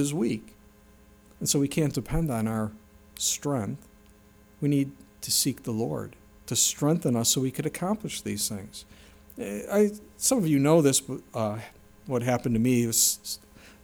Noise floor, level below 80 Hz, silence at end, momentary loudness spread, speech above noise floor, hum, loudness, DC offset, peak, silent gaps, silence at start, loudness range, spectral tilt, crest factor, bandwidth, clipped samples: -55 dBFS; -50 dBFS; 0.15 s; 15 LU; 29 dB; none; -26 LUFS; under 0.1%; -8 dBFS; none; 0 s; 5 LU; -4 dB/octave; 20 dB; over 20 kHz; under 0.1%